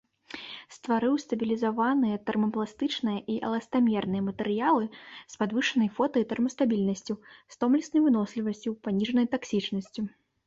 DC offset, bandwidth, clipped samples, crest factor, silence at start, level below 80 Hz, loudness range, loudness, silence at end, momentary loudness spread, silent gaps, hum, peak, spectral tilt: under 0.1%; 7.8 kHz; under 0.1%; 16 dB; 0.35 s; -68 dBFS; 1 LU; -28 LUFS; 0.4 s; 12 LU; none; none; -12 dBFS; -6 dB/octave